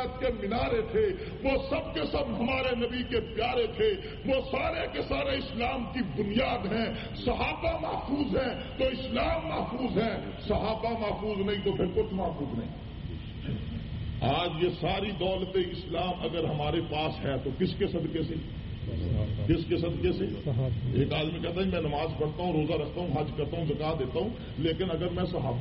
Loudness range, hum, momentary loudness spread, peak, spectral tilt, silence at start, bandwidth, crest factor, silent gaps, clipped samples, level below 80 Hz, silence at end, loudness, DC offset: 2 LU; none; 5 LU; -14 dBFS; -5 dB/octave; 0 s; 5.8 kHz; 16 dB; none; under 0.1%; -42 dBFS; 0 s; -31 LUFS; under 0.1%